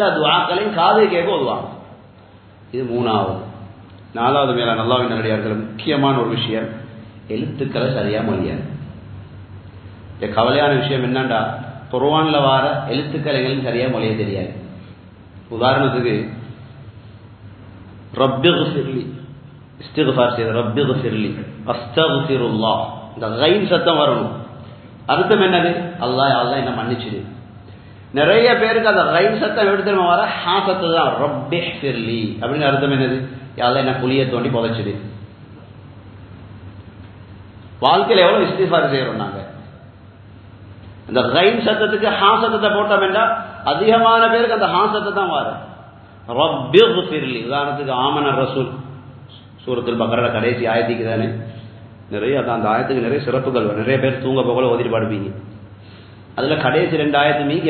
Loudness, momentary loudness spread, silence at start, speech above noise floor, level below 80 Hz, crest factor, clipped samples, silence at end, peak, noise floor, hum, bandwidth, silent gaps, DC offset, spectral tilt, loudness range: -17 LUFS; 19 LU; 0 s; 27 dB; -50 dBFS; 18 dB; under 0.1%; 0 s; 0 dBFS; -44 dBFS; none; 4.6 kHz; none; under 0.1%; -9 dB/octave; 6 LU